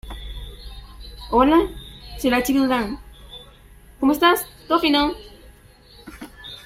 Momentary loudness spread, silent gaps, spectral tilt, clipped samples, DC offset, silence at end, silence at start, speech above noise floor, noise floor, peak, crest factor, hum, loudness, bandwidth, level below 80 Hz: 24 LU; none; -4 dB/octave; under 0.1%; under 0.1%; 0.05 s; 0.05 s; 30 dB; -48 dBFS; -2 dBFS; 20 dB; none; -19 LUFS; 16 kHz; -40 dBFS